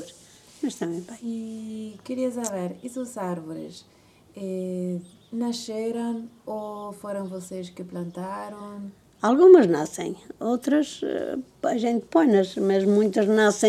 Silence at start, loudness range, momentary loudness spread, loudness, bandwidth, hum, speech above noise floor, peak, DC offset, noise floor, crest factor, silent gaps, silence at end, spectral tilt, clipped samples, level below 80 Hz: 0 s; 12 LU; 17 LU; -24 LUFS; 13.5 kHz; none; 27 dB; -2 dBFS; under 0.1%; -51 dBFS; 22 dB; none; 0 s; -5.5 dB/octave; under 0.1%; -68 dBFS